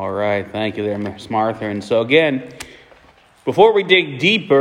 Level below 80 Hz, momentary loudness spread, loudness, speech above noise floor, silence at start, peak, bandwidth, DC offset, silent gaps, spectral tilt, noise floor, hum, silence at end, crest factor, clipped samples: -58 dBFS; 13 LU; -17 LUFS; 33 dB; 0 s; 0 dBFS; 12 kHz; under 0.1%; none; -5.5 dB/octave; -50 dBFS; none; 0 s; 18 dB; under 0.1%